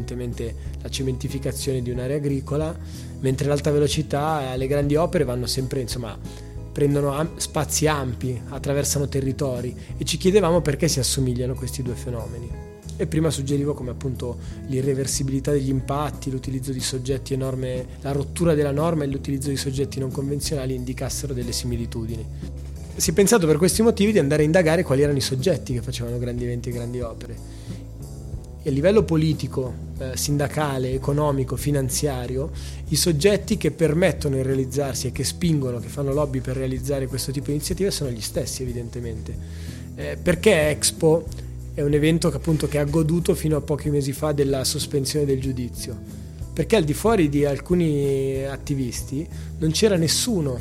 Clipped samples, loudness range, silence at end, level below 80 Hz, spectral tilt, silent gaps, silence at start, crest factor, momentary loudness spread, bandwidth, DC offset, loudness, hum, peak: under 0.1%; 6 LU; 0 s; -36 dBFS; -5 dB/octave; none; 0 s; 20 dB; 14 LU; 16.5 kHz; under 0.1%; -23 LUFS; none; -4 dBFS